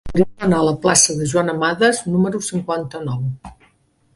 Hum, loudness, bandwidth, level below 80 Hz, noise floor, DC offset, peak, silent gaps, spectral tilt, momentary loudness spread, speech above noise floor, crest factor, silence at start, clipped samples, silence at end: none; -18 LUFS; 11.5 kHz; -44 dBFS; -59 dBFS; under 0.1%; 0 dBFS; none; -4 dB/octave; 12 LU; 41 dB; 18 dB; 0.05 s; under 0.1%; 0.6 s